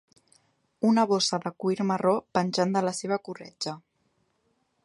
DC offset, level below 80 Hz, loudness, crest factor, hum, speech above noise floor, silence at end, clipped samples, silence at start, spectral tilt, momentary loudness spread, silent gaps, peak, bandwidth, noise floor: under 0.1%; -72 dBFS; -27 LUFS; 20 dB; none; 46 dB; 1.05 s; under 0.1%; 0.8 s; -5 dB/octave; 12 LU; none; -8 dBFS; 11.5 kHz; -72 dBFS